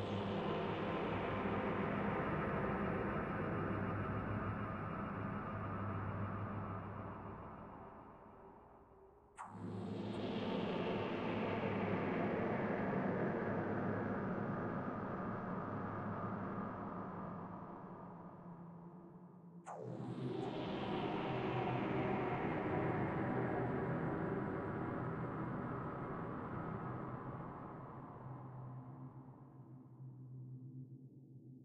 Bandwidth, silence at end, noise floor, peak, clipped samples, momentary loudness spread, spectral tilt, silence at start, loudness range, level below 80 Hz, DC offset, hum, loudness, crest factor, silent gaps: 9.2 kHz; 0 s; -64 dBFS; -26 dBFS; under 0.1%; 16 LU; -8.5 dB/octave; 0 s; 11 LU; -62 dBFS; under 0.1%; none; -42 LUFS; 16 dB; none